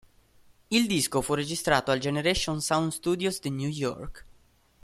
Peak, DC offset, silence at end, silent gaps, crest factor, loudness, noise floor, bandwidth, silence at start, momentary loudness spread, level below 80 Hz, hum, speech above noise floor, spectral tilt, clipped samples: -8 dBFS; under 0.1%; 0.6 s; none; 20 dB; -27 LUFS; -61 dBFS; 16 kHz; 0.7 s; 7 LU; -50 dBFS; none; 34 dB; -4 dB/octave; under 0.1%